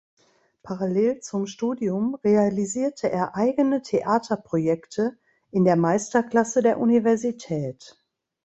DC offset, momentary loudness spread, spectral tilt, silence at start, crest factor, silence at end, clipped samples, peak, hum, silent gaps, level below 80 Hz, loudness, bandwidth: under 0.1%; 9 LU; -6.5 dB/octave; 0.65 s; 16 dB; 0.55 s; under 0.1%; -6 dBFS; none; none; -64 dBFS; -23 LUFS; 8.2 kHz